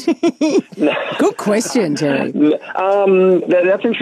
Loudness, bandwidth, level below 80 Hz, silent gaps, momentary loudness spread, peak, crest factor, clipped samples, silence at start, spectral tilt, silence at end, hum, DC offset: -15 LUFS; 13 kHz; -70 dBFS; none; 5 LU; -4 dBFS; 10 dB; under 0.1%; 0 s; -5 dB/octave; 0 s; none; under 0.1%